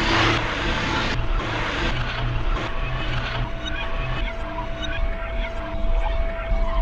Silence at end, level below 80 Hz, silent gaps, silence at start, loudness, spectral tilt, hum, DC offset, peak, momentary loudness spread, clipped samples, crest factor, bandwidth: 0 s; -26 dBFS; none; 0 s; -26 LUFS; -5 dB/octave; none; under 0.1%; -8 dBFS; 7 LU; under 0.1%; 16 dB; 7.8 kHz